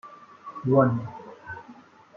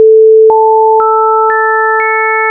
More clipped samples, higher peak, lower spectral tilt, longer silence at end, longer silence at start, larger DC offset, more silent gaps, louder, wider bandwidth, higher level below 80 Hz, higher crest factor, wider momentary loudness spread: neither; second, -6 dBFS vs 0 dBFS; first, -10.5 dB/octave vs 8.5 dB/octave; first, 0.45 s vs 0 s; about the same, 0.05 s vs 0 s; neither; neither; second, -24 LUFS vs -7 LUFS; first, 6.2 kHz vs 2.5 kHz; about the same, -66 dBFS vs -62 dBFS; first, 22 dB vs 6 dB; first, 22 LU vs 5 LU